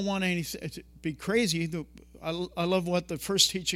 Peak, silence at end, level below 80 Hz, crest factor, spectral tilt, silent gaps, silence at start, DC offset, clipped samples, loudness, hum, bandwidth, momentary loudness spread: -6 dBFS; 0 s; -56 dBFS; 22 dB; -3.5 dB/octave; none; 0 s; under 0.1%; under 0.1%; -29 LUFS; none; 17.5 kHz; 15 LU